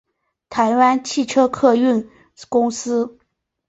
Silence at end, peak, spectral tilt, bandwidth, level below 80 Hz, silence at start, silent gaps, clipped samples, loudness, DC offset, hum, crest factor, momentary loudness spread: 0.6 s; -2 dBFS; -4 dB/octave; 8.2 kHz; -60 dBFS; 0.5 s; none; under 0.1%; -18 LUFS; under 0.1%; none; 16 dB; 8 LU